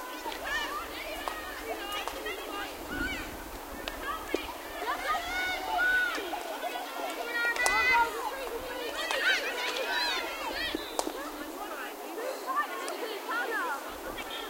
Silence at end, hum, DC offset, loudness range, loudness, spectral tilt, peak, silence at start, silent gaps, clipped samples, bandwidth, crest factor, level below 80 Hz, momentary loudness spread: 0 s; none; under 0.1%; 7 LU; -32 LUFS; -1.5 dB/octave; -6 dBFS; 0 s; none; under 0.1%; 16 kHz; 26 dB; -54 dBFS; 12 LU